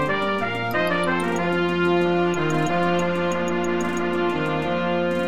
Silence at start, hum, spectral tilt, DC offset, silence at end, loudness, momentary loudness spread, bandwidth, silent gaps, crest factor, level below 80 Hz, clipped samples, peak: 0 s; none; -6 dB/octave; 1%; 0 s; -22 LUFS; 3 LU; 13 kHz; none; 12 dB; -52 dBFS; under 0.1%; -10 dBFS